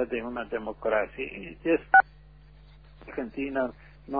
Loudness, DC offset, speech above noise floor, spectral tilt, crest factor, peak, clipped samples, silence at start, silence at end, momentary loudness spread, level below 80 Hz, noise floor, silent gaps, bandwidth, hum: -27 LUFS; 0.1%; 25 dB; -8.5 dB/octave; 22 dB; -6 dBFS; under 0.1%; 0 s; 0 s; 16 LU; -54 dBFS; -52 dBFS; none; 4.9 kHz; none